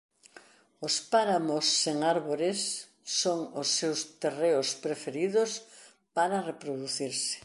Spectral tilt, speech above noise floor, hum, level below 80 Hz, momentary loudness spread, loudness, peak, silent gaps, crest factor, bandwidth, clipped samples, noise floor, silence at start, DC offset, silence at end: -2.5 dB/octave; 27 dB; none; -82 dBFS; 8 LU; -29 LUFS; -12 dBFS; none; 18 dB; 11.5 kHz; under 0.1%; -57 dBFS; 0.35 s; under 0.1%; 0.05 s